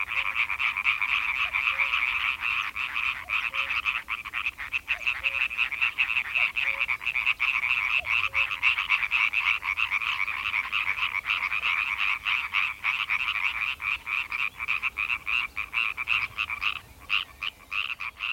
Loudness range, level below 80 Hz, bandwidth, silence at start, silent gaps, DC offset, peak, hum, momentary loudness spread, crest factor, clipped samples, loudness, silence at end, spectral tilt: 4 LU; -56 dBFS; 19 kHz; 0 s; none; under 0.1%; -8 dBFS; none; 6 LU; 20 dB; under 0.1%; -25 LUFS; 0 s; -0.5 dB/octave